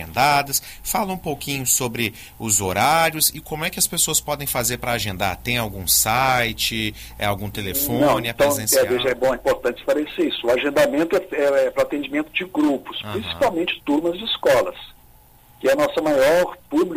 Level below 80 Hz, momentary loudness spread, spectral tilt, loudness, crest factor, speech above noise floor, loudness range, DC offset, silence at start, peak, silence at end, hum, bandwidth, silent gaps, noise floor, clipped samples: -44 dBFS; 9 LU; -3 dB/octave; -20 LUFS; 16 dB; 29 dB; 2 LU; under 0.1%; 0 s; -6 dBFS; 0 s; none; 16 kHz; none; -50 dBFS; under 0.1%